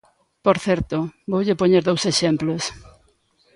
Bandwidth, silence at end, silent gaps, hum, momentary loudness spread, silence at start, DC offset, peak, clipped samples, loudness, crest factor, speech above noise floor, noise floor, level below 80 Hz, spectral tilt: 11.5 kHz; 0.75 s; none; none; 9 LU; 0.45 s; under 0.1%; -2 dBFS; under 0.1%; -21 LUFS; 18 dB; 41 dB; -61 dBFS; -48 dBFS; -5 dB/octave